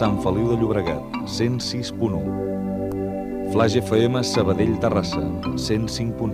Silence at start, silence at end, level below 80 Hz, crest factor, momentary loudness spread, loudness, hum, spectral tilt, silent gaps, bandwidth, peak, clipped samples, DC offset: 0 s; 0 s; -42 dBFS; 18 dB; 7 LU; -23 LUFS; none; -6 dB/octave; none; 15.5 kHz; -4 dBFS; under 0.1%; under 0.1%